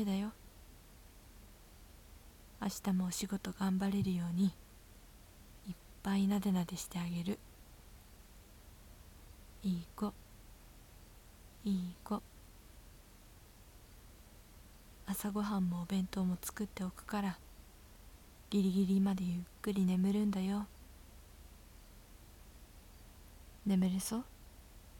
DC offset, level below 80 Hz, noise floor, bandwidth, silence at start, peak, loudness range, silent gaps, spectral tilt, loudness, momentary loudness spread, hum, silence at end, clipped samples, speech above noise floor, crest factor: under 0.1%; -58 dBFS; -59 dBFS; 17.5 kHz; 0 s; -24 dBFS; 11 LU; none; -6 dB/octave; -37 LUFS; 26 LU; none; 0 s; under 0.1%; 23 dB; 16 dB